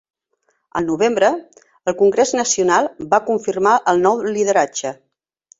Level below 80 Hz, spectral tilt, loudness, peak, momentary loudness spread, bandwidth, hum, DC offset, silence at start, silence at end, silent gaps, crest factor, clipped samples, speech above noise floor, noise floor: -60 dBFS; -3.5 dB/octave; -17 LUFS; -2 dBFS; 11 LU; 8 kHz; none; under 0.1%; 0.75 s; 0.65 s; none; 16 dB; under 0.1%; 50 dB; -67 dBFS